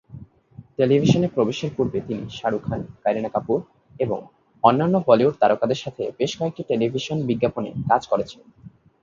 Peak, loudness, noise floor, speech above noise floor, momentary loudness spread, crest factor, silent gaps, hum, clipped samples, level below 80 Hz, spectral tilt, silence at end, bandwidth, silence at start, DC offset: 0 dBFS; -22 LUFS; -47 dBFS; 25 dB; 11 LU; 22 dB; none; none; under 0.1%; -54 dBFS; -7 dB/octave; 0.35 s; 7.6 kHz; 0.1 s; under 0.1%